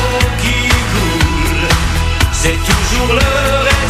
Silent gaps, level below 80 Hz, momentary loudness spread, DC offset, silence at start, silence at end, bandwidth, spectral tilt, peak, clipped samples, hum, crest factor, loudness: none; -18 dBFS; 2 LU; under 0.1%; 0 s; 0 s; 15.5 kHz; -4 dB/octave; 0 dBFS; under 0.1%; none; 12 dB; -13 LUFS